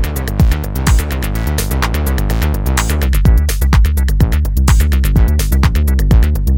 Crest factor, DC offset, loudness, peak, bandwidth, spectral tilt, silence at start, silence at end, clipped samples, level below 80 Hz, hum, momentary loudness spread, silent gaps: 12 dB; under 0.1%; -14 LUFS; 0 dBFS; 17 kHz; -5.5 dB/octave; 0 s; 0 s; under 0.1%; -12 dBFS; none; 4 LU; none